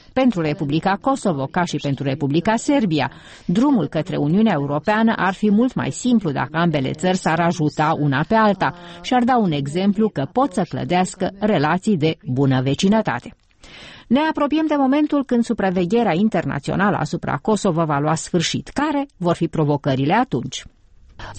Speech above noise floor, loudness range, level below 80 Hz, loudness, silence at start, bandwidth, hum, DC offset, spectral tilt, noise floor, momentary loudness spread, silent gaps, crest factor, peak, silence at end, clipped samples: 23 dB; 2 LU; -48 dBFS; -19 LUFS; 0.15 s; 8.8 kHz; none; under 0.1%; -6 dB/octave; -41 dBFS; 6 LU; none; 12 dB; -6 dBFS; 0 s; under 0.1%